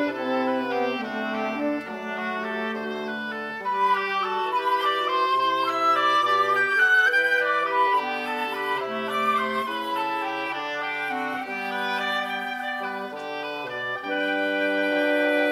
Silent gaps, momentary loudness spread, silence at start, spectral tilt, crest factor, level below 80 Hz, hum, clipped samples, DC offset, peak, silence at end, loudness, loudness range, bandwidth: none; 10 LU; 0 s; -3.5 dB/octave; 14 dB; -70 dBFS; none; under 0.1%; under 0.1%; -10 dBFS; 0 s; -24 LUFS; 7 LU; 16 kHz